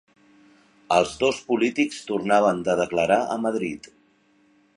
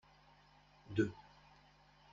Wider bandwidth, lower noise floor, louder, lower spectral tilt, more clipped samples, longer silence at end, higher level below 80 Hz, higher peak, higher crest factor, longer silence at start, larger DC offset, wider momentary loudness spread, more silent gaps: first, 11 kHz vs 7.4 kHz; second, -61 dBFS vs -67 dBFS; first, -23 LUFS vs -40 LUFS; second, -4.5 dB/octave vs -6.5 dB/octave; neither; about the same, 0.9 s vs 0.9 s; first, -60 dBFS vs -70 dBFS; first, -4 dBFS vs -22 dBFS; about the same, 20 dB vs 24 dB; about the same, 0.9 s vs 0.9 s; neither; second, 8 LU vs 26 LU; neither